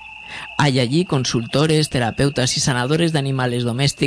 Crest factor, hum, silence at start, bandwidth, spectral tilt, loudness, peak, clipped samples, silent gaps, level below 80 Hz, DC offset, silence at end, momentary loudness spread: 18 dB; none; 0 s; 11 kHz; -4.5 dB/octave; -18 LUFS; 0 dBFS; under 0.1%; none; -46 dBFS; under 0.1%; 0 s; 4 LU